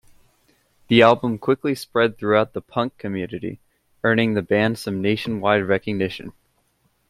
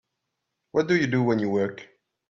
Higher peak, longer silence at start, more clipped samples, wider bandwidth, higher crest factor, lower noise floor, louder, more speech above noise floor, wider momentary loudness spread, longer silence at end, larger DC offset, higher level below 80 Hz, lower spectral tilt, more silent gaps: first, -2 dBFS vs -10 dBFS; first, 0.9 s vs 0.75 s; neither; first, 15 kHz vs 7.6 kHz; about the same, 20 dB vs 18 dB; second, -66 dBFS vs -81 dBFS; first, -21 LUFS vs -24 LUFS; second, 45 dB vs 58 dB; first, 13 LU vs 8 LU; first, 0.8 s vs 0.45 s; neither; first, -58 dBFS vs -64 dBFS; about the same, -6.5 dB/octave vs -7 dB/octave; neither